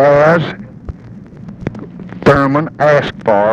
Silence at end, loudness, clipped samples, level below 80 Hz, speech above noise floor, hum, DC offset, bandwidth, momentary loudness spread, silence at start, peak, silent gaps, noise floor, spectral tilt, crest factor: 0 s; -12 LUFS; under 0.1%; -38 dBFS; 20 dB; none; under 0.1%; 8.4 kHz; 22 LU; 0 s; 0 dBFS; none; -33 dBFS; -7.5 dB/octave; 12 dB